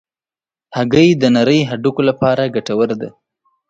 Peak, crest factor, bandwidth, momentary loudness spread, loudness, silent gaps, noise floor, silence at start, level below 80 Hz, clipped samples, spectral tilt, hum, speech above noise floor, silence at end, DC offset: 0 dBFS; 16 dB; 7.8 kHz; 11 LU; -14 LUFS; none; under -90 dBFS; 0.7 s; -52 dBFS; under 0.1%; -6.5 dB/octave; none; over 76 dB; 0.6 s; under 0.1%